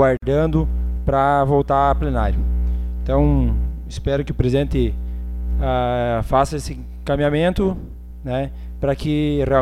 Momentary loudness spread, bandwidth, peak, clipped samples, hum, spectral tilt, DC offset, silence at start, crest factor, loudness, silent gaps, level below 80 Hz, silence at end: 11 LU; 11.5 kHz; -4 dBFS; under 0.1%; 60 Hz at -25 dBFS; -7.5 dB/octave; under 0.1%; 0 s; 16 dB; -20 LUFS; none; -24 dBFS; 0 s